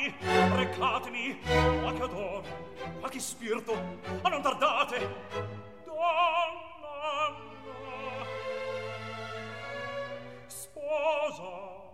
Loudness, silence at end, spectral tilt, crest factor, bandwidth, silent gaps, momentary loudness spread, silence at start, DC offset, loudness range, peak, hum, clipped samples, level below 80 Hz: -32 LUFS; 0 s; -4.5 dB/octave; 20 dB; 16 kHz; none; 16 LU; 0 s; 0.2%; 7 LU; -12 dBFS; none; under 0.1%; -50 dBFS